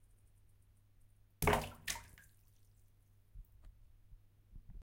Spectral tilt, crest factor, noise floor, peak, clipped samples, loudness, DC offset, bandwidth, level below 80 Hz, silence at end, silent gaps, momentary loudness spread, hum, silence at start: -4 dB/octave; 28 dB; -67 dBFS; -16 dBFS; under 0.1%; -38 LUFS; under 0.1%; 16.5 kHz; -56 dBFS; 0 s; none; 27 LU; none; 1.4 s